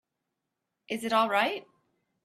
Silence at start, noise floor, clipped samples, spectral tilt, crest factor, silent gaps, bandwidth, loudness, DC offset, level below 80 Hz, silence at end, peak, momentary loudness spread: 0.9 s; -84 dBFS; under 0.1%; -3.5 dB/octave; 22 dB; none; 15 kHz; -28 LUFS; under 0.1%; -78 dBFS; 0.65 s; -10 dBFS; 13 LU